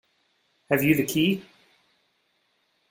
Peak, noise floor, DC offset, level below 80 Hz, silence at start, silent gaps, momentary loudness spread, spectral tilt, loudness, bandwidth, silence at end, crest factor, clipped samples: -6 dBFS; -71 dBFS; under 0.1%; -60 dBFS; 0.7 s; none; 6 LU; -5 dB/octave; -24 LUFS; 16.5 kHz; 1.5 s; 22 dB; under 0.1%